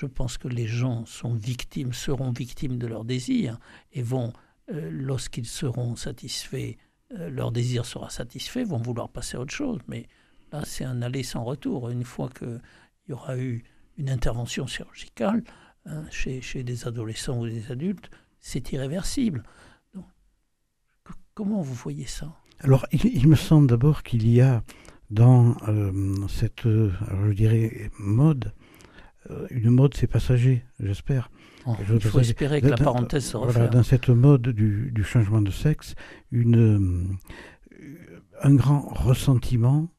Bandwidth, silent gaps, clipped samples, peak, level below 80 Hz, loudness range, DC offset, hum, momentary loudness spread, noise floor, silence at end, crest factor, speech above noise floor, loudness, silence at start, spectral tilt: 13.5 kHz; none; under 0.1%; -4 dBFS; -40 dBFS; 11 LU; under 0.1%; none; 18 LU; -72 dBFS; 0.1 s; 20 dB; 48 dB; -24 LUFS; 0 s; -7 dB/octave